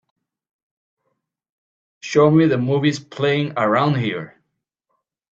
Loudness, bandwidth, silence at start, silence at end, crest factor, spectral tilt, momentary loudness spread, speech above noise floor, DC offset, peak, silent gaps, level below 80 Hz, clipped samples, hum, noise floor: -18 LUFS; 7.8 kHz; 2.05 s; 1.05 s; 18 dB; -6.5 dB/octave; 14 LU; 58 dB; under 0.1%; -2 dBFS; none; -64 dBFS; under 0.1%; none; -75 dBFS